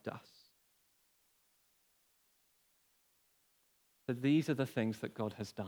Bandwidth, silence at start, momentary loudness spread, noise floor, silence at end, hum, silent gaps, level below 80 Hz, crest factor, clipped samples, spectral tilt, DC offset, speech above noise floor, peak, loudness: over 20 kHz; 0.05 s; 15 LU; -74 dBFS; 0 s; none; none; -86 dBFS; 20 dB; under 0.1%; -7 dB/octave; under 0.1%; 39 dB; -22 dBFS; -36 LUFS